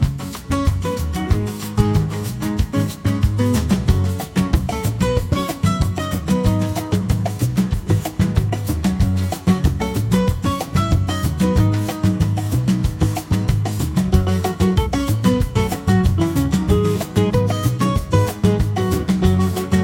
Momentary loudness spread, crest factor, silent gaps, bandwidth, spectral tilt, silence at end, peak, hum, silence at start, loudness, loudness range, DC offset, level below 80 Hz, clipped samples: 4 LU; 18 dB; none; 17 kHz; -6.5 dB/octave; 0 s; 0 dBFS; none; 0 s; -19 LUFS; 2 LU; under 0.1%; -28 dBFS; under 0.1%